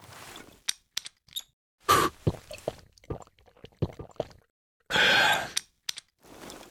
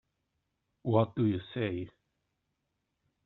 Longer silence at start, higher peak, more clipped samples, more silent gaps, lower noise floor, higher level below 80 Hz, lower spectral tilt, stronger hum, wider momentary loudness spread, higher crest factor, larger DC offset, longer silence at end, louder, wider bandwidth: second, 0.15 s vs 0.85 s; first, -6 dBFS vs -12 dBFS; neither; first, 1.53-1.78 s, 4.50-4.80 s vs none; second, -55 dBFS vs -83 dBFS; first, -54 dBFS vs -70 dBFS; second, -2.5 dB/octave vs -7 dB/octave; neither; first, 23 LU vs 12 LU; about the same, 26 dB vs 24 dB; neither; second, 0.1 s vs 1.35 s; first, -28 LUFS vs -32 LUFS; first, over 20 kHz vs 4.1 kHz